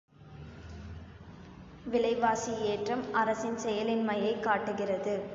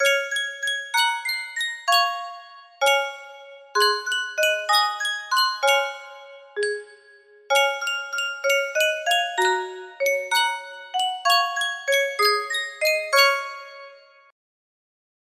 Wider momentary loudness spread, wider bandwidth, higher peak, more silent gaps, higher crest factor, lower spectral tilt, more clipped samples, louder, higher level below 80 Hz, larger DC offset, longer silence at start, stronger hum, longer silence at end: first, 20 LU vs 13 LU; second, 7.8 kHz vs 16 kHz; second, -14 dBFS vs -4 dBFS; neither; about the same, 18 dB vs 20 dB; first, -5 dB/octave vs 1.5 dB/octave; neither; second, -31 LUFS vs -22 LUFS; first, -56 dBFS vs -76 dBFS; neither; first, 0.2 s vs 0 s; neither; second, 0 s vs 1.35 s